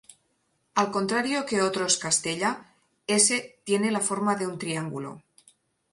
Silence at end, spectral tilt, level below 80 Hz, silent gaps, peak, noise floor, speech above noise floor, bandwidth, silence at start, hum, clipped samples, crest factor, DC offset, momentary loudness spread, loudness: 0.75 s; -2.5 dB/octave; -70 dBFS; none; -6 dBFS; -72 dBFS; 46 dB; 11.5 kHz; 0.75 s; none; under 0.1%; 22 dB; under 0.1%; 12 LU; -25 LUFS